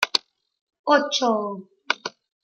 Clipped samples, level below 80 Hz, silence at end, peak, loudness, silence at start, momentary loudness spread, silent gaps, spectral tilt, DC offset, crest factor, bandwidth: under 0.1%; -82 dBFS; 0.35 s; 0 dBFS; -23 LUFS; 0 s; 14 LU; 0.61-0.67 s, 0.79-0.84 s; -2.5 dB/octave; under 0.1%; 26 dB; 16 kHz